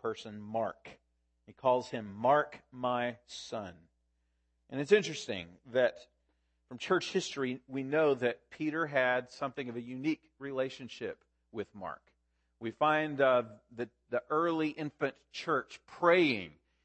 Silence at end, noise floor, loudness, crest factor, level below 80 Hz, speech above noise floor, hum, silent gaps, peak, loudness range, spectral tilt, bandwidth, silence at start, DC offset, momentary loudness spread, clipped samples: 0.35 s; -77 dBFS; -33 LUFS; 22 dB; -76 dBFS; 44 dB; none; none; -12 dBFS; 4 LU; -5 dB/octave; 8.8 kHz; 0.05 s; under 0.1%; 15 LU; under 0.1%